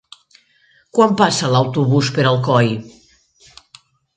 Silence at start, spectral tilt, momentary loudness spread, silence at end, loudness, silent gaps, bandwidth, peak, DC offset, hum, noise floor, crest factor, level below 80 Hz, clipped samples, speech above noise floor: 0.95 s; -5.5 dB/octave; 6 LU; 1.25 s; -16 LUFS; none; 9.4 kHz; 0 dBFS; under 0.1%; none; -56 dBFS; 18 dB; -58 dBFS; under 0.1%; 41 dB